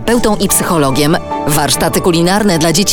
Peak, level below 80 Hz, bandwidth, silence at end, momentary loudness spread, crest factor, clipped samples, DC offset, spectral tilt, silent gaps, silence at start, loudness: 0 dBFS; -30 dBFS; over 20 kHz; 0 s; 3 LU; 10 dB; under 0.1%; under 0.1%; -4 dB/octave; none; 0 s; -11 LUFS